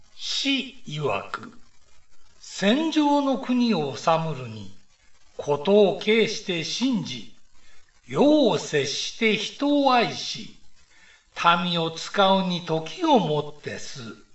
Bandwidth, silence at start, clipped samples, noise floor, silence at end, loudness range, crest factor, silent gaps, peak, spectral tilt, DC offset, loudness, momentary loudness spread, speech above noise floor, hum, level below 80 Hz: 8.4 kHz; 0 s; under 0.1%; -55 dBFS; 0.1 s; 2 LU; 20 dB; none; -4 dBFS; -4.5 dB/octave; 0.4%; -23 LUFS; 16 LU; 32 dB; none; -60 dBFS